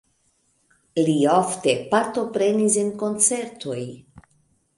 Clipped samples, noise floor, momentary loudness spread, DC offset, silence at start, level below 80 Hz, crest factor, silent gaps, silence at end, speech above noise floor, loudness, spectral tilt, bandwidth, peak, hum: under 0.1%; -66 dBFS; 12 LU; under 0.1%; 0.95 s; -66 dBFS; 18 dB; none; 0.6 s; 45 dB; -21 LUFS; -4 dB/octave; 11.5 kHz; -6 dBFS; none